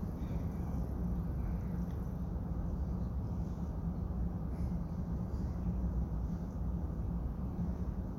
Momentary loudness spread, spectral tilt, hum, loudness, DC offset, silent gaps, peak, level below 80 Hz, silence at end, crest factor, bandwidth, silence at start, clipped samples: 2 LU; -10 dB/octave; none; -39 LUFS; under 0.1%; none; -26 dBFS; -40 dBFS; 0 s; 12 dB; 6.6 kHz; 0 s; under 0.1%